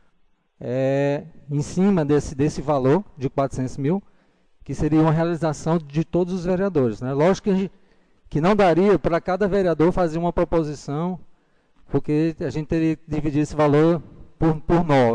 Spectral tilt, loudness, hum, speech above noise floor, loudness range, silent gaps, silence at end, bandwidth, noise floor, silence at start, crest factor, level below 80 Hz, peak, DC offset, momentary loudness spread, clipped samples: -7.5 dB/octave; -22 LUFS; none; 41 dB; 3 LU; none; 0 s; 10 kHz; -61 dBFS; 0.6 s; 10 dB; -40 dBFS; -10 dBFS; under 0.1%; 9 LU; under 0.1%